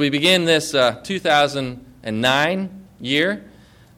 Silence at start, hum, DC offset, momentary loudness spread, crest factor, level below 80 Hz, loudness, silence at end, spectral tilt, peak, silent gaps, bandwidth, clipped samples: 0 s; none; under 0.1%; 15 LU; 16 dB; -54 dBFS; -18 LUFS; 0.5 s; -4 dB/octave; -4 dBFS; none; 17 kHz; under 0.1%